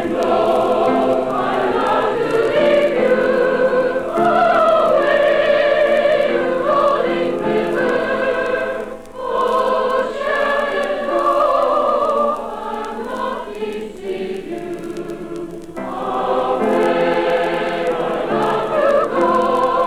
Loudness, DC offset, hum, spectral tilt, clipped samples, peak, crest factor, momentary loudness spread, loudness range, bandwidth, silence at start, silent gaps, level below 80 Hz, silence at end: -17 LUFS; under 0.1%; none; -5.5 dB/octave; under 0.1%; -4 dBFS; 12 dB; 12 LU; 8 LU; 13.5 kHz; 0 s; none; -46 dBFS; 0 s